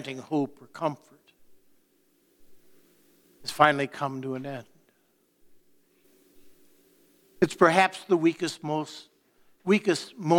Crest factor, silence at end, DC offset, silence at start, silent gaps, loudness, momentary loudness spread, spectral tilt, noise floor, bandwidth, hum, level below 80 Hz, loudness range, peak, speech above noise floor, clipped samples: 26 dB; 0 s; under 0.1%; 0 s; none; -26 LUFS; 18 LU; -5 dB/octave; -68 dBFS; 18 kHz; none; -70 dBFS; 14 LU; -2 dBFS; 43 dB; under 0.1%